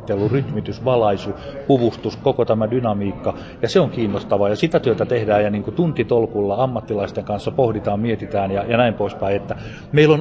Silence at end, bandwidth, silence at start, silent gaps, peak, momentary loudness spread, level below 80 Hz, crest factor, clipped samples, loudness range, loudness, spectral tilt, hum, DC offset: 0 s; 8 kHz; 0 s; none; -2 dBFS; 7 LU; -44 dBFS; 16 dB; under 0.1%; 2 LU; -20 LUFS; -7.5 dB/octave; none; under 0.1%